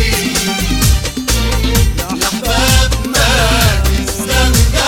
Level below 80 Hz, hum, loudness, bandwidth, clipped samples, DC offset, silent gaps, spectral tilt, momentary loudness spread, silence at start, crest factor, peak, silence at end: -16 dBFS; none; -13 LUFS; 18 kHz; under 0.1%; under 0.1%; none; -3.5 dB/octave; 5 LU; 0 s; 12 dB; 0 dBFS; 0 s